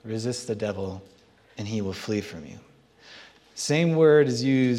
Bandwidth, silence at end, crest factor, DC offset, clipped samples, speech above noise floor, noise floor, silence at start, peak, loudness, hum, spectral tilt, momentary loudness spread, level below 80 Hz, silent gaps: 13.5 kHz; 0 s; 18 dB; under 0.1%; under 0.1%; 27 dB; -51 dBFS; 0.05 s; -8 dBFS; -24 LUFS; none; -5.5 dB/octave; 24 LU; -68 dBFS; none